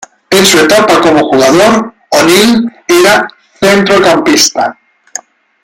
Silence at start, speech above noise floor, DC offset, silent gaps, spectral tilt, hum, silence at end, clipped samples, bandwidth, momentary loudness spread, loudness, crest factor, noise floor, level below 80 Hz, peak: 0 s; 21 dB; under 0.1%; none; -3 dB/octave; none; 0.9 s; 0.2%; 19.5 kHz; 11 LU; -7 LUFS; 8 dB; -27 dBFS; -44 dBFS; 0 dBFS